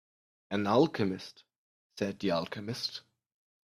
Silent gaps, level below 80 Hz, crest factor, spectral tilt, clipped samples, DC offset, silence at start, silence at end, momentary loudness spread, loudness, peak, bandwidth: 1.58-1.90 s; -72 dBFS; 22 dB; -6 dB/octave; under 0.1%; under 0.1%; 0.5 s; 0.65 s; 18 LU; -32 LUFS; -12 dBFS; 14.5 kHz